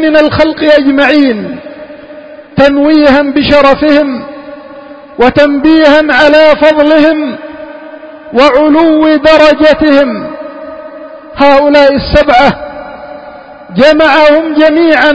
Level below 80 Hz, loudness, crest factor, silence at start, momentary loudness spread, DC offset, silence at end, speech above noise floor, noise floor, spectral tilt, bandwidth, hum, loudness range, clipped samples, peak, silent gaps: -32 dBFS; -6 LUFS; 6 dB; 0 s; 21 LU; under 0.1%; 0 s; 23 dB; -29 dBFS; -6 dB/octave; 8 kHz; none; 2 LU; 3%; 0 dBFS; none